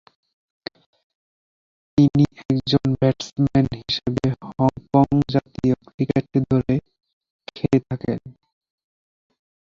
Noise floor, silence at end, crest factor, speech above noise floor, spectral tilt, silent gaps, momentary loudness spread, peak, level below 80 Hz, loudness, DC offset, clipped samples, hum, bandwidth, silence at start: under -90 dBFS; 1.35 s; 20 dB; over 70 dB; -8 dB/octave; 2.45-2.49 s, 5.94-5.98 s, 7.13-7.21 s, 7.30-7.39 s; 11 LU; -2 dBFS; -48 dBFS; -21 LUFS; under 0.1%; under 0.1%; none; 7.4 kHz; 1.95 s